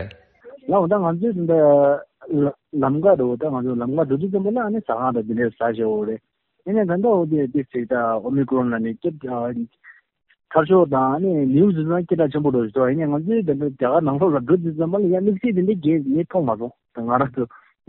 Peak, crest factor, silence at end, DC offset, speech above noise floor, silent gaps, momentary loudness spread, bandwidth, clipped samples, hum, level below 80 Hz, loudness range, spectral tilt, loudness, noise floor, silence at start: -2 dBFS; 18 dB; 0.4 s; under 0.1%; 26 dB; none; 9 LU; 4.1 kHz; under 0.1%; none; -58 dBFS; 3 LU; -8.5 dB/octave; -20 LUFS; -45 dBFS; 0 s